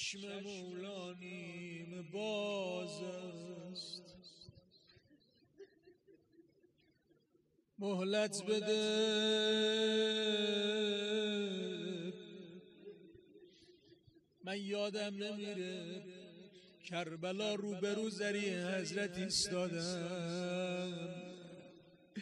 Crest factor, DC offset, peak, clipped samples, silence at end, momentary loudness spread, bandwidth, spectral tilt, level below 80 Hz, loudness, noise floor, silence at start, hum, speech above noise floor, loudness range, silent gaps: 18 dB; under 0.1%; -24 dBFS; under 0.1%; 0 s; 21 LU; 11.5 kHz; -4 dB/octave; -80 dBFS; -39 LUFS; -75 dBFS; 0 s; none; 37 dB; 14 LU; none